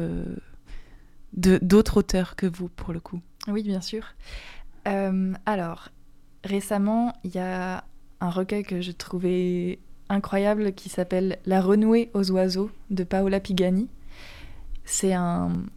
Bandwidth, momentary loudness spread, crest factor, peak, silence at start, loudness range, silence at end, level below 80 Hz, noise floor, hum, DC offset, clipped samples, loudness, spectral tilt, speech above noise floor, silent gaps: 15 kHz; 19 LU; 20 dB; -6 dBFS; 0 s; 6 LU; 0.05 s; -42 dBFS; -46 dBFS; none; under 0.1%; under 0.1%; -25 LUFS; -6 dB/octave; 22 dB; none